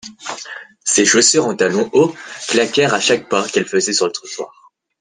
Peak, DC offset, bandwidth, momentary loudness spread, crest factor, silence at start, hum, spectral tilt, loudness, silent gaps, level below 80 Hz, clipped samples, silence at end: 0 dBFS; under 0.1%; 10.5 kHz; 17 LU; 16 dB; 0.05 s; none; -2.5 dB/octave; -15 LUFS; none; -60 dBFS; under 0.1%; 0.55 s